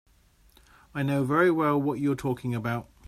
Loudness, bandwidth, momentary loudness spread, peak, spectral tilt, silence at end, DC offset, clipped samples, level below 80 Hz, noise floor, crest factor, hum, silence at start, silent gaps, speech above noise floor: -26 LUFS; 15 kHz; 9 LU; -10 dBFS; -7.5 dB/octave; 0.25 s; under 0.1%; under 0.1%; -58 dBFS; -60 dBFS; 18 dB; none; 0.95 s; none; 35 dB